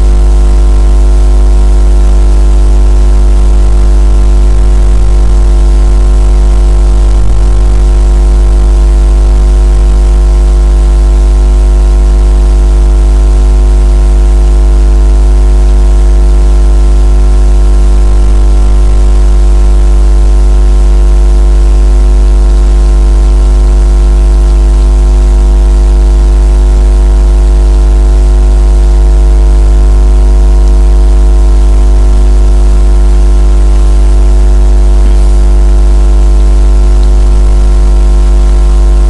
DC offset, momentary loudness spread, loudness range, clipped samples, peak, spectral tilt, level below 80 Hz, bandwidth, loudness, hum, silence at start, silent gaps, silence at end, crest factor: under 0.1%; 1 LU; 1 LU; 0.2%; 0 dBFS; -7 dB/octave; -4 dBFS; 10.5 kHz; -8 LUFS; 50 Hz at -5 dBFS; 0 s; none; 0 s; 4 dB